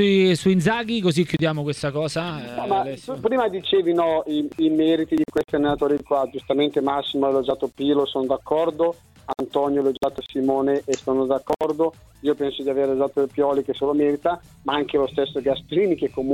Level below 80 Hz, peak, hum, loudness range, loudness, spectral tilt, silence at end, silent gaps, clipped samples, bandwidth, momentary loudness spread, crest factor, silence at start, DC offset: -54 dBFS; -6 dBFS; none; 2 LU; -22 LUFS; -6 dB/octave; 0 s; none; under 0.1%; 14 kHz; 6 LU; 16 dB; 0 s; under 0.1%